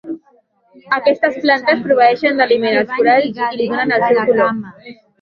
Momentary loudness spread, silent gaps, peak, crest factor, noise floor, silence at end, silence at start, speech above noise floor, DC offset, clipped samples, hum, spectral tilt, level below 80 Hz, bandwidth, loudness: 8 LU; none; 0 dBFS; 14 dB; -55 dBFS; 0.3 s; 0.05 s; 40 dB; under 0.1%; under 0.1%; none; -6.5 dB/octave; -62 dBFS; 6.4 kHz; -14 LUFS